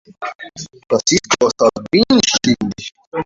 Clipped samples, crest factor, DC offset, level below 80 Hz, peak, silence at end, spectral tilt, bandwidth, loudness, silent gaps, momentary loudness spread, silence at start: under 0.1%; 16 dB; under 0.1%; -48 dBFS; 0 dBFS; 0 s; -3 dB/octave; 7.8 kHz; -15 LUFS; 0.35-0.39 s, 3.07-3.12 s; 18 LU; 0.2 s